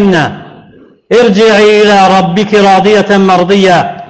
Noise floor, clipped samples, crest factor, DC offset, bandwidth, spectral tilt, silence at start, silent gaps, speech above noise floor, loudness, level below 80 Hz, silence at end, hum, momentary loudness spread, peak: -37 dBFS; under 0.1%; 6 dB; 0.5%; 9 kHz; -5.5 dB/octave; 0 s; none; 32 dB; -6 LUFS; -42 dBFS; 0.05 s; none; 4 LU; 0 dBFS